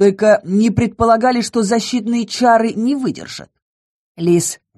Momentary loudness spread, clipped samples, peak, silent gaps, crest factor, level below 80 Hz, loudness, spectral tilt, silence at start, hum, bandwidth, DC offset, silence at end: 9 LU; under 0.1%; 0 dBFS; 3.62-4.15 s; 16 dB; -44 dBFS; -15 LUFS; -5 dB/octave; 0 s; none; 13 kHz; under 0.1%; 0.25 s